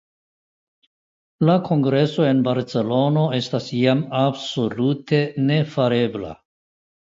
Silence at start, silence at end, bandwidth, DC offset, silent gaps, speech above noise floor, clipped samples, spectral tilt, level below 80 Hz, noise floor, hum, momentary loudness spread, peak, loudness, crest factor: 1.4 s; 0.65 s; 7.6 kHz; under 0.1%; none; over 71 dB; under 0.1%; -7.5 dB/octave; -60 dBFS; under -90 dBFS; none; 6 LU; -4 dBFS; -20 LUFS; 16 dB